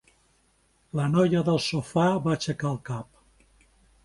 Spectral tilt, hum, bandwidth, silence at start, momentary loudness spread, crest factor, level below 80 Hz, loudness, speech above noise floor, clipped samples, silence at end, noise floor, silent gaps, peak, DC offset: -6.5 dB/octave; none; 11.5 kHz; 0.95 s; 13 LU; 18 dB; -58 dBFS; -26 LUFS; 41 dB; under 0.1%; 1 s; -66 dBFS; none; -10 dBFS; under 0.1%